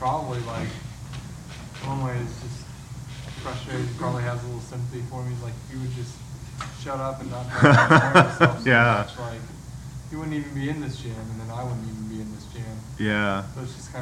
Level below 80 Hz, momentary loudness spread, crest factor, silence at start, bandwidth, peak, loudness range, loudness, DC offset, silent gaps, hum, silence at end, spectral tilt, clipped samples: -46 dBFS; 21 LU; 24 dB; 0 s; 13.5 kHz; 0 dBFS; 13 LU; -24 LUFS; under 0.1%; none; none; 0 s; -6 dB/octave; under 0.1%